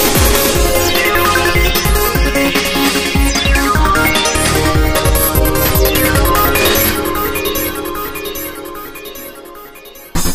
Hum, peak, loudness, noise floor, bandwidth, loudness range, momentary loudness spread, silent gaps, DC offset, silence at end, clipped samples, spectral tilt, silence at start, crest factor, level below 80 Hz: none; 0 dBFS; -12 LUFS; -35 dBFS; 16 kHz; 5 LU; 16 LU; none; under 0.1%; 0 s; under 0.1%; -3.5 dB/octave; 0 s; 12 dB; -20 dBFS